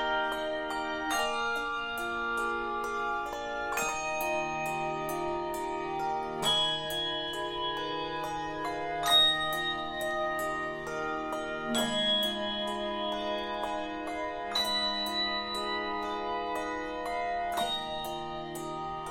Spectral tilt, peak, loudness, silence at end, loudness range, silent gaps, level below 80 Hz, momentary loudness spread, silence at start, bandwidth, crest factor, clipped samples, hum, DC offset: -2.5 dB/octave; -14 dBFS; -31 LUFS; 0 s; 4 LU; none; -56 dBFS; 8 LU; 0 s; 16.5 kHz; 18 dB; under 0.1%; none; under 0.1%